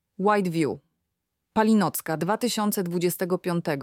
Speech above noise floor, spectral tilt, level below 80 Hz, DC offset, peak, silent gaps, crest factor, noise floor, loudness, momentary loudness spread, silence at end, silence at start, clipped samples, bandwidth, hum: 56 dB; -5.5 dB/octave; -68 dBFS; under 0.1%; -8 dBFS; none; 18 dB; -81 dBFS; -25 LUFS; 6 LU; 0 s; 0.2 s; under 0.1%; 17.5 kHz; none